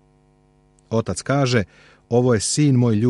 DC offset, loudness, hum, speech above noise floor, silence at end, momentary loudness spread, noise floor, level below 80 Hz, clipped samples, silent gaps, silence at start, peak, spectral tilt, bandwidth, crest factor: under 0.1%; -19 LUFS; none; 38 dB; 0 s; 8 LU; -57 dBFS; -52 dBFS; under 0.1%; none; 0.9 s; -4 dBFS; -5.5 dB/octave; 11.5 kHz; 16 dB